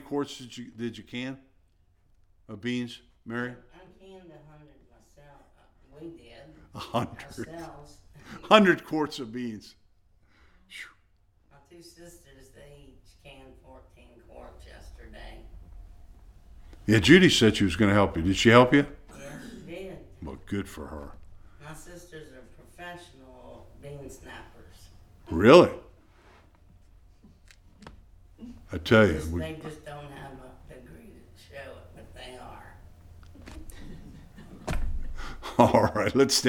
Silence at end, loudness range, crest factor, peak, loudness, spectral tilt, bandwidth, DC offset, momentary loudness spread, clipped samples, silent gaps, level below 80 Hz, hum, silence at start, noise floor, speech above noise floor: 0 s; 24 LU; 26 dB; -2 dBFS; -23 LUFS; -5 dB/octave; 18 kHz; under 0.1%; 28 LU; under 0.1%; none; -46 dBFS; none; 0.1 s; -64 dBFS; 39 dB